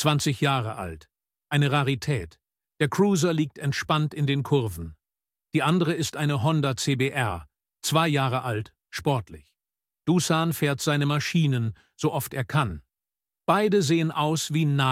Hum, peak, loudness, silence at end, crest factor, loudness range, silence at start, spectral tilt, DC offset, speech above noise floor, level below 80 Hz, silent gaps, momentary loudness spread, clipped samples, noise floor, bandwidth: none; -6 dBFS; -25 LUFS; 0 s; 18 dB; 1 LU; 0 s; -5.5 dB/octave; under 0.1%; over 66 dB; -54 dBFS; none; 11 LU; under 0.1%; under -90 dBFS; 16 kHz